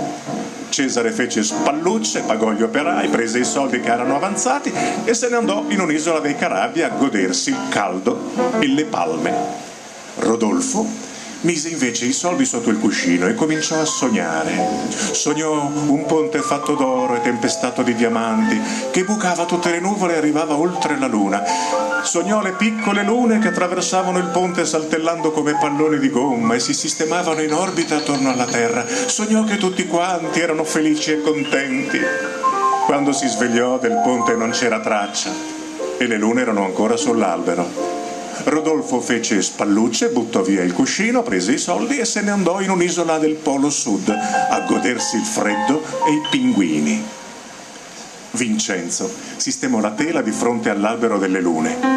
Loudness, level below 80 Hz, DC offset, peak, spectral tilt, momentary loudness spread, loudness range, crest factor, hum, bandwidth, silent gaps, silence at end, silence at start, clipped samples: -18 LUFS; -60 dBFS; under 0.1%; -2 dBFS; -3.5 dB/octave; 4 LU; 2 LU; 16 dB; none; 14 kHz; none; 0 s; 0 s; under 0.1%